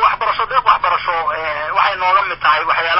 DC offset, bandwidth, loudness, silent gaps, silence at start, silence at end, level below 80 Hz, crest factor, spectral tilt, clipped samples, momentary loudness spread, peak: under 0.1%; 5.8 kHz; -15 LUFS; none; 0 s; 0 s; -48 dBFS; 16 dB; -5.5 dB/octave; under 0.1%; 5 LU; 0 dBFS